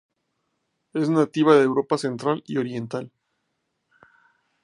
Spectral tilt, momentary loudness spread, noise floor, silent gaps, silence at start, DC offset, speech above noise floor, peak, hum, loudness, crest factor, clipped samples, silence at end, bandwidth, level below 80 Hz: -6.5 dB/octave; 15 LU; -76 dBFS; none; 0.95 s; under 0.1%; 55 dB; -4 dBFS; none; -22 LUFS; 22 dB; under 0.1%; 1.55 s; 11 kHz; -74 dBFS